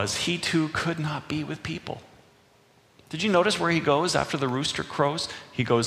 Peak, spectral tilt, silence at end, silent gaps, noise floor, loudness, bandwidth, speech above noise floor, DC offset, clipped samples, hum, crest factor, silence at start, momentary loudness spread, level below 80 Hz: -6 dBFS; -4.5 dB/octave; 0 s; none; -59 dBFS; -26 LUFS; 15.5 kHz; 33 dB; under 0.1%; under 0.1%; none; 20 dB; 0 s; 11 LU; -56 dBFS